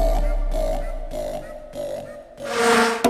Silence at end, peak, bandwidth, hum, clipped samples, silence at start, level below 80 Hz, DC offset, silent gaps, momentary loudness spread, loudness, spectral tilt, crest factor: 0 s; -4 dBFS; 15 kHz; none; under 0.1%; 0 s; -26 dBFS; under 0.1%; none; 17 LU; -24 LUFS; -4 dB/octave; 18 dB